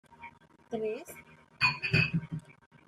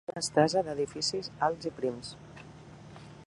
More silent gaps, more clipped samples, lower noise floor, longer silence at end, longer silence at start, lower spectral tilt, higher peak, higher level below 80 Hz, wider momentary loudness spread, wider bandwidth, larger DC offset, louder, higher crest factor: neither; neither; about the same, -53 dBFS vs -50 dBFS; first, 0.35 s vs 0 s; about the same, 0.1 s vs 0.1 s; first, -5.5 dB/octave vs -4 dB/octave; second, -14 dBFS vs -10 dBFS; about the same, -60 dBFS vs -64 dBFS; about the same, 23 LU vs 23 LU; first, 13.5 kHz vs 11.5 kHz; neither; about the same, -30 LUFS vs -30 LUFS; about the same, 20 dB vs 22 dB